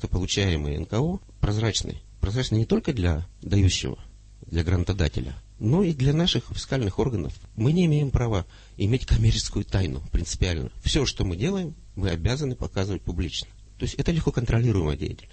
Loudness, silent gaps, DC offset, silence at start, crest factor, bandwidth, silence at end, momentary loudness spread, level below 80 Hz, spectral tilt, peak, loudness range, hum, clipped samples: -26 LUFS; none; under 0.1%; 0 s; 16 dB; 8.8 kHz; 0.05 s; 10 LU; -34 dBFS; -5.5 dB/octave; -10 dBFS; 3 LU; none; under 0.1%